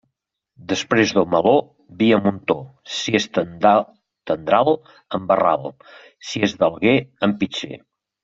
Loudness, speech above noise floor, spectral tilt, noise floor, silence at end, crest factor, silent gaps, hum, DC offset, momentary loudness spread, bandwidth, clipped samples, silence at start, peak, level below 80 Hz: -19 LUFS; 58 dB; -5 dB/octave; -77 dBFS; 0.45 s; 18 dB; none; none; under 0.1%; 13 LU; 7.8 kHz; under 0.1%; 0.6 s; -2 dBFS; -58 dBFS